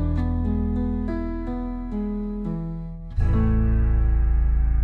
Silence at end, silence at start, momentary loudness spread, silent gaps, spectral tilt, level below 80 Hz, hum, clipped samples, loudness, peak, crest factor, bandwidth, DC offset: 0 s; 0 s; 8 LU; none; -11 dB/octave; -24 dBFS; none; under 0.1%; -25 LUFS; -12 dBFS; 10 dB; 4.2 kHz; under 0.1%